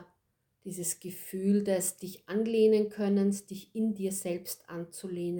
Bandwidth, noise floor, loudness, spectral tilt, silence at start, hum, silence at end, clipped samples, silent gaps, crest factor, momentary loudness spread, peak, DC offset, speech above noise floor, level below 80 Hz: 19.5 kHz; -77 dBFS; -31 LUFS; -5.5 dB/octave; 0 s; none; 0 s; under 0.1%; none; 16 dB; 15 LU; -14 dBFS; under 0.1%; 46 dB; -74 dBFS